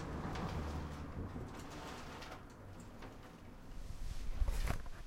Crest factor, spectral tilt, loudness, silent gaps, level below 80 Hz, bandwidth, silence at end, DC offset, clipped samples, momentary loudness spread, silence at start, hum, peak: 22 dB; -5.5 dB/octave; -47 LUFS; none; -44 dBFS; 16 kHz; 0 s; under 0.1%; under 0.1%; 12 LU; 0 s; none; -20 dBFS